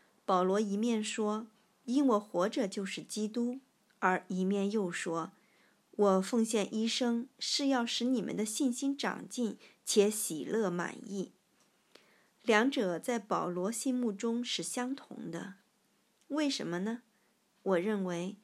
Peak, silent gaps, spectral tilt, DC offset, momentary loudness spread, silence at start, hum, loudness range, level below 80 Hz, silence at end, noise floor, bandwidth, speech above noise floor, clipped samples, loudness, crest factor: -12 dBFS; none; -4 dB/octave; under 0.1%; 12 LU; 0.3 s; none; 4 LU; under -90 dBFS; 0.1 s; -73 dBFS; 14 kHz; 40 dB; under 0.1%; -33 LUFS; 22 dB